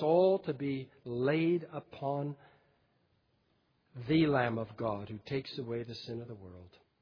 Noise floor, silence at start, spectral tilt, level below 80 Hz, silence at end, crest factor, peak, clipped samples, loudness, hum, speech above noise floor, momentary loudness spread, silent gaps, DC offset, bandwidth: -74 dBFS; 0 s; -6 dB/octave; -70 dBFS; 0.35 s; 18 dB; -16 dBFS; under 0.1%; -34 LUFS; none; 41 dB; 19 LU; none; under 0.1%; 5.4 kHz